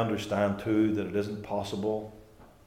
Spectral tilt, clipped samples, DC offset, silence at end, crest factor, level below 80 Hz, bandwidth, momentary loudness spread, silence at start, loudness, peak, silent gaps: -6.5 dB/octave; under 0.1%; under 0.1%; 0.2 s; 16 dB; -60 dBFS; 15.5 kHz; 7 LU; 0 s; -30 LUFS; -14 dBFS; none